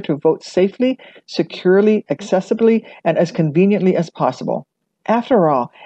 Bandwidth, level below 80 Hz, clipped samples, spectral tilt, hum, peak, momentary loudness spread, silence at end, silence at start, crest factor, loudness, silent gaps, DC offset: 8.4 kHz; -66 dBFS; under 0.1%; -7.5 dB/octave; none; -4 dBFS; 10 LU; 0 s; 0 s; 14 dB; -17 LUFS; none; under 0.1%